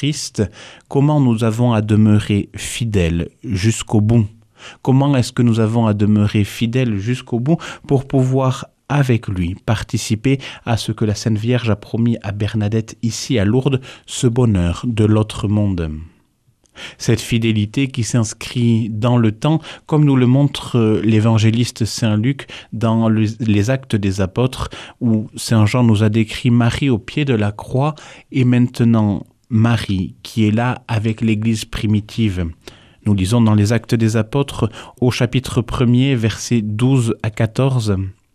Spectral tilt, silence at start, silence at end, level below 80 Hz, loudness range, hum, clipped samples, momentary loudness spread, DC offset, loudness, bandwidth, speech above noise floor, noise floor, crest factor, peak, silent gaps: -6.5 dB/octave; 0 s; 0.2 s; -40 dBFS; 3 LU; none; under 0.1%; 8 LU; under 0.1%; -17 LUFS; 13.5 kHz; 42 dB; -58 dBFS; 14 dB; -2 dBFS; none